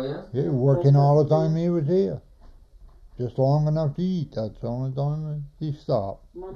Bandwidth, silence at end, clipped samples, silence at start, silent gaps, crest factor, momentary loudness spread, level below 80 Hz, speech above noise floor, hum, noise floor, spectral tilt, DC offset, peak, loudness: 6.4 kHz; 0 s; under 0.1%; 0 s; none; 16 dB; 14 LU; -50 dBFS; 26 dB; none; -49 dBFS; -10 dB/octave; under 0.1%; -8 dBFS; -24 LUFS